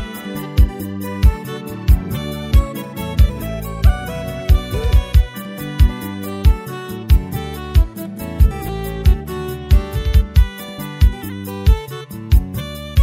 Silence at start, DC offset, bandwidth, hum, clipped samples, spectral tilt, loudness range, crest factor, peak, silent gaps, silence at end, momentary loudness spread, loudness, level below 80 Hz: 0 s; under 0.1%; 16.5 kHz; none; under 0.1%; -6.5 dB/octave; 1 LU; 16 dB; 0 dBFS; none; 0 s; 10 LU; -19 LUFS; -18 dBFS